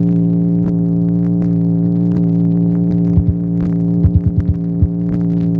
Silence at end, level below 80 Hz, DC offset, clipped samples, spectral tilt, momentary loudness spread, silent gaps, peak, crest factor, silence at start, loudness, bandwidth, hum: 0 s; -28 dBFS; under 0.1%; under 0.1%; -13 dB/octave; 3 LU; none; -2 dBFS; 12 dB; 0 s; -15 LUFS; 2 kHz; none